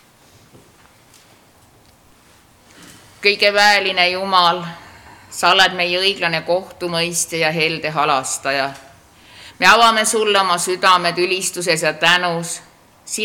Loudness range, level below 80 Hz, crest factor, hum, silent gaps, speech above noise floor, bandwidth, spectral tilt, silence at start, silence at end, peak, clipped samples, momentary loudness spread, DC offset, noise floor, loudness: 4 LU; -58 dBFS; 18 dB; none; none; 34 dB; 19 kHz; -2 dB/octave; 2.8 s; 0 s; 0 dBFS; under 0.1%; 10 LU; under 0.1%; -50 dBFS; -15 LUFS